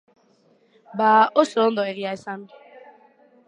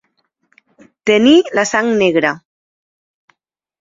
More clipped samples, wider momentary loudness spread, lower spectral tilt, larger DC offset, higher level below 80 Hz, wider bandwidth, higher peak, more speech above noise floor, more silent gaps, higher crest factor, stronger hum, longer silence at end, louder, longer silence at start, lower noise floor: neither; first, 19 LU vs 11 LU; about the same, -5 dB/octave vs -4 dB/octave; neither; second, -80 dBFS vs -58 dBFS; first, 10 kHz vs 7.8 kHz; about the same, -2 dBFS vs 0 dBFS; second, 40 dB vs 58 dB; neither; first, 22 dB vs 16 dB; neither; second, 0.7 s vs 1.45 s; second, -20 LUFS vs -13 LUFS; about the same, 0.95 s vs 1.05 s; second, -60 dBFS vs -70 dBFS